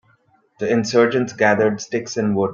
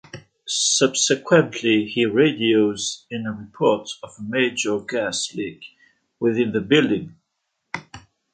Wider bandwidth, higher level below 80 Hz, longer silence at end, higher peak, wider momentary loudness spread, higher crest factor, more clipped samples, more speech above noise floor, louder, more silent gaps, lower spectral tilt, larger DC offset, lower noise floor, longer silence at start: second, 7.4 kHz vs 9.4 kHz; about the same, -60 dBFS vs -62 dBFS; second, 0 s vs 0.35 s; about the same, -2 dBFS vs -2 dBFS; second, 8 LU vs 16 LU; about the same, 16 dB vs 20 dB; neither; second, 41 dB vs 55 dB; about the same, -19 LUFS vs -20 LUFS; neither; first, -5.5 dB/octave vs -3.5 dB/octave; neither; second, -59 dBFS vs -76 dBFS; first, 0.6 s vs 0.15 s